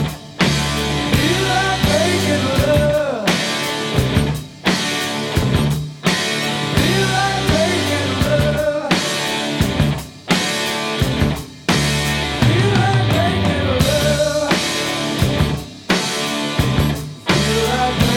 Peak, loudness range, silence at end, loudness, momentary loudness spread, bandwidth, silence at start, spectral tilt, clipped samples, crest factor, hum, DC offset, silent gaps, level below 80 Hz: 0 dBFS; 2 LU; 0 s; -17 LUFS; 4 LU; 19 kHz; 0 s; -4.5 dB/octave; under 0.1%; 16 dB; none; under 0.1%; none; -32 dBFS